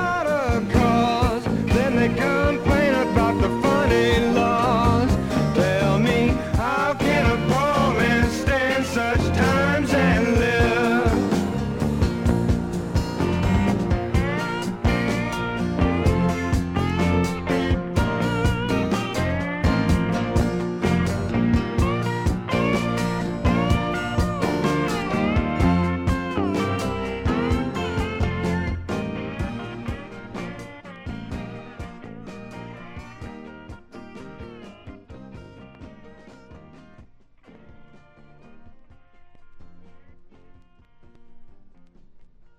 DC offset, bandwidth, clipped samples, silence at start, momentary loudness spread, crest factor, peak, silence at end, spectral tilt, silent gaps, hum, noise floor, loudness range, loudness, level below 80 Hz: under 0.1%; 16.5 kHz; under 0.1%; 0 s; 19 LU; 18 dB; -4 dBFS; 0.15 s; -6.5 dB/octave; none; none; -50 dBFS; 17 LU; -22 LUFS; -32 dBFS